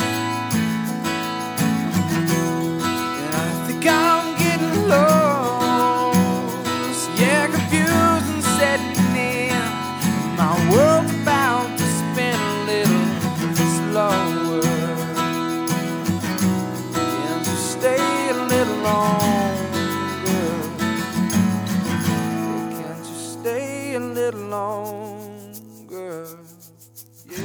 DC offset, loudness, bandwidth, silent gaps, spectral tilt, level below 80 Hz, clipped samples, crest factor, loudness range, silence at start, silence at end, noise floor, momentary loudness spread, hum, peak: under 0.1%; -20 LUFS; over 20 kHz; none; -5 dB/octave; -58 dBFS; under 0.1%; 18 dB; 7 LU; 0 s; 0 s; -46 dBFS; 10 LU; none; -2 dBFS